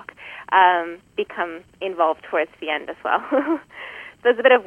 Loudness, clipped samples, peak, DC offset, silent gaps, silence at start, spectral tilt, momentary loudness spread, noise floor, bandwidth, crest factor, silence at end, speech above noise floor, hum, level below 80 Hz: -21 LUFS; under 0.1%; -2 dBFS; under 0.1%; none; 0.2 s; -5 dB/octave; 18 LU; -39 dBFS; 4.4 kHz; 20 dB; 0 s; 18 dB; none; -66 dBFS